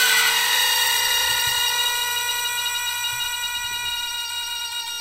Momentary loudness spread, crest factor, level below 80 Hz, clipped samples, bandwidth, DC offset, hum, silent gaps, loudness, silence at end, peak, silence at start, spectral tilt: 9 LU; 16 dB; -54 dBFS; under 0.1%; 16 kHz; under 0.1%; none; none; -20 LUFS; 0 s; -6 dBFS; 0 s; 2.5 dB/octave